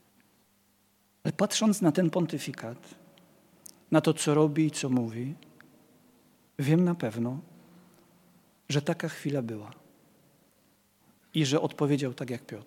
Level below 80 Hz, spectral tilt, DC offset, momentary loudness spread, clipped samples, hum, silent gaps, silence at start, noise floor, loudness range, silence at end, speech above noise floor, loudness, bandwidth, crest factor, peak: -78 dBFS; -5.5 dB/octave; under 0.1%; 15 LU; under 0.1%; none; none; 1.25 s; -68 dBFS; 8 LU; 0.05 s; 40 dB; -29 LUFS; 16.5 kHz; 22 dB; -8 dBFS